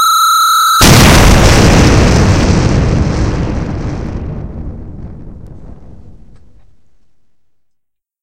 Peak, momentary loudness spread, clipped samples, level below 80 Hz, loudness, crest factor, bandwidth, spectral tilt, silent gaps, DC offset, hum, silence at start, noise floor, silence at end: 0 dBFS; 21 LU; 1%; -18 dBFS; -8 LUFS; 10 dB; over 20 kHz; -4.5 dB/octave; none; 2%; none; 0 s; -65 dBFS; 2.5 s